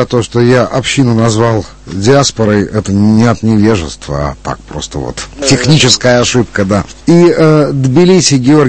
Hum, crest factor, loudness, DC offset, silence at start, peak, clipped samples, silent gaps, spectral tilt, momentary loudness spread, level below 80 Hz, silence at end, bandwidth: none; 8 dB; -9 LUFS; under 0.1%; 0 s; 0 dBFS; 0.9%; none; -5 dB/octave; 13 LU; -32 dBFS; 0 s; 11 kHz